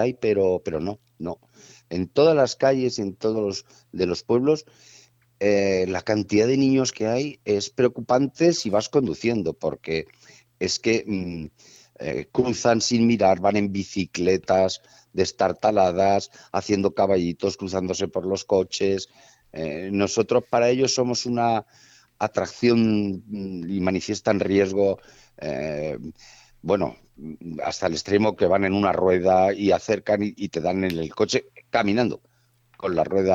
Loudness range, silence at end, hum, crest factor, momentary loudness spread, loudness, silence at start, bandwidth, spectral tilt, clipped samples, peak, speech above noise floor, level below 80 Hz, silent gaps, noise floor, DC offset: 4 LU; 0 s; none; 18 dB; 12 LU; -23 LUFS; 0 s; 8 kHz; -5 dB/octave; under 0.1%; -6 dBFS; 39 dB; -56 dBFS; none; -62 dBFS; under 0.1%